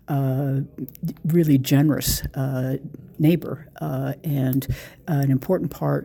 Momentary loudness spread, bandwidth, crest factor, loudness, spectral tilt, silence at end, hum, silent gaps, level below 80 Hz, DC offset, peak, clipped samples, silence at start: 13 LU; 19.5 kHz; 16 dB; -23 LUFS; -6.5 dB/octave; 0 s; none; none; -42 dBFS; under 0.1%; -6 dBFS; under 0.1%; 0.1 s